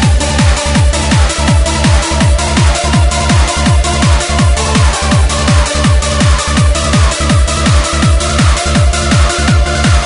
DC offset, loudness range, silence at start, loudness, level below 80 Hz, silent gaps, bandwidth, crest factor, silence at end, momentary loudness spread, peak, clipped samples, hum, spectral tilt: under 0.1%; 0 LU; 0 s; -10 LUFS; -12 dBFS; none; 11 kHz; 10 dB; 0 s; 1 LU; 0 dBFS; under 0.1%; none; -4.5 dB/octave